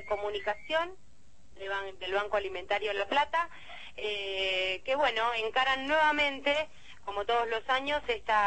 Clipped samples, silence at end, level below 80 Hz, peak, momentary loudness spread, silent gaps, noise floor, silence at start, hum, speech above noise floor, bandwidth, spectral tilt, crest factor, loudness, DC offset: under 0.1%; 0 s; -60 dBFS; -16 dBFS; 11 LU; none; -62 dBFS; 0 s; none; 31 dB; 8.8 kHz; -2.5 dB/octave; 16 dB; -30 LUFS; 0.5%